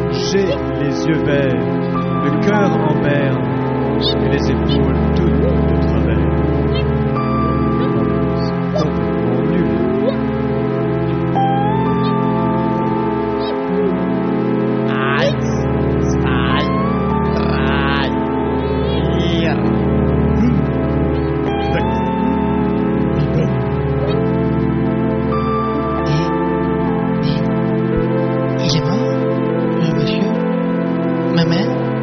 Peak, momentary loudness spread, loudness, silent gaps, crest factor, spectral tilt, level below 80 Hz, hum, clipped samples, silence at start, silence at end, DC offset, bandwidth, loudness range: -2 dBFS; 3 LU; -16 LUFS; none; 14 dB; -6.5 dB/octave; -28 dBFS; none; under 0.1%; 0 s; 0 s; under 0.1%; 6.6 kHz; 1 LU